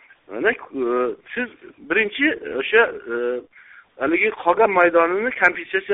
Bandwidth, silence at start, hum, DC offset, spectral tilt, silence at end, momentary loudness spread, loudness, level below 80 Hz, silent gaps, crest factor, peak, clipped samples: 4 kHz; 0.3 s; none; under 0.1%; -1.5 dB/octave; 0 s; 12 LU; -20 LUFS; -60 dBFS; none; 20 dB; -2 dBFS; under 0.1%